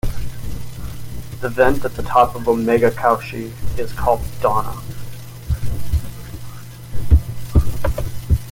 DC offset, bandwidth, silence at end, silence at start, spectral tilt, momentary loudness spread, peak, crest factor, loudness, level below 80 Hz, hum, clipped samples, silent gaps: under 0.1%; 17 kHz; 0 s; 0.05 s; -7 dB/octave; 18 LU; 0 dBFS; 18 dB; -20 LUFS; -26 dBFS; none; under 0.1%; none